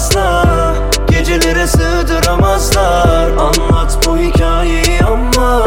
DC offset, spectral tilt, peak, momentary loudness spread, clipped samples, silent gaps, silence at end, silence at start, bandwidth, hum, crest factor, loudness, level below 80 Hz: under 0.1%; -4.5 dB/octave; 0 dBFS; 3 LU; under 0.1%; none; 0 s; 0 s; 17 kHz; none; 10 dB; -12 LUFS; -14 dBFS